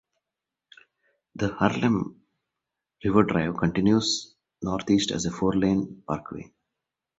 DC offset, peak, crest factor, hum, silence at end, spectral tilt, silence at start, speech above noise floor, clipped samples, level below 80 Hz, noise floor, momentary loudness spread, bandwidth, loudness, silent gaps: under 0.1%; -4 dBFS; 22 dB; none; 0.75 s; -5.5 dB/octave; 1.35 s; 63 dB; under 0.1%; -52 dBFS; -87 dBFS; 11 LU; 8.2 kHz; -25 LUFS; none